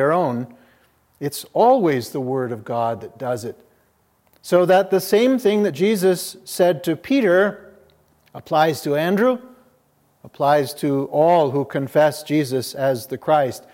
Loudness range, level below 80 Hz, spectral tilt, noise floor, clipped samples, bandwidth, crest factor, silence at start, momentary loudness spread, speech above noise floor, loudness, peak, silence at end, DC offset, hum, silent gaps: 4 LU; -68 dBFS; -5.5 dB/octave; -62 dBFS; under 0.1%; 17 kHz; 18 dB; 0 s; 11 LU; 43 dB; -19 LUFS; -2 dBFS; 0.15 s; under 0.1%; none; none